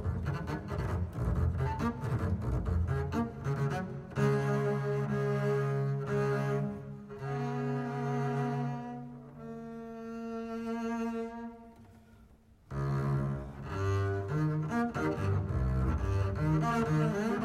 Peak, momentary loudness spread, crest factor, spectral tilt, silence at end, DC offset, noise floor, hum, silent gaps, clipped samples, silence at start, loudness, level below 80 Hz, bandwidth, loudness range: -18 dBFS; 12 LU; 16 dB; -8 dB/octave; 0 s; under 0.1%; -59 dBFS; none; none; under 0.1%; 0 s; -33 LUFS; -44 dBFS; 12.5 kHz; 7 LU